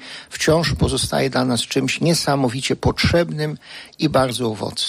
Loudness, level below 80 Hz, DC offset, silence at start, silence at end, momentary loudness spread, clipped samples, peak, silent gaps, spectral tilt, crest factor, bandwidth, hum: -19 LUFS; -38 dBFS; under 0.1%; 0 s; 0 s; 8 LU; under 0.1%; -6 dBFS; none; -4.5 dB/octave; 14 dB; 15.5 kHz; none